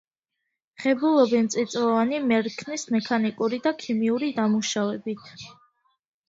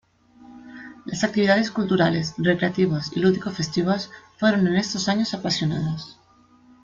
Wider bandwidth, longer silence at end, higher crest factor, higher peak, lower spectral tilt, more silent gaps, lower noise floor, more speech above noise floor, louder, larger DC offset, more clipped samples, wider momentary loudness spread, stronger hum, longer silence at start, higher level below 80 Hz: about the same, 7.8 kHz vs 7.6 kHz; about the same, 0.75 s vs 0.7 s; about the same, 18 dB vs 18 dB; about the same, -8 dBFS vs -6 dBFS; about the same, -4.5 dB/octave vs -5.5 dB/octave; neither; first, -82 dBFS vs -55 dBFS; first, 58 dB vs 33 dB; about the same, -24 LUFS vs -22 LUFS; neither; neither; second, 12 LU vs 15 LU; neither; first, 0.8 s vs 0.4 s; second, -68 dBFS vs -58 dBFS